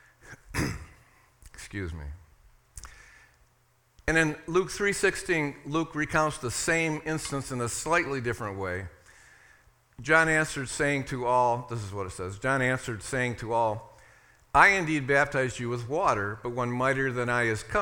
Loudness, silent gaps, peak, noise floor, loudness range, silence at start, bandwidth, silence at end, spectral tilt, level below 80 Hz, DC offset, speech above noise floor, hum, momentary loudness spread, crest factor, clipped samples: -27 LUFS; none; -4 dBFS; -66 dBFS; 8 LU; 0.25 s; 18 kHz; 0 s; -4.5 dB/octave; -50 dBFS; under 0.1%; 39 dB; none; 13 LU; 26 dB; under 0.1%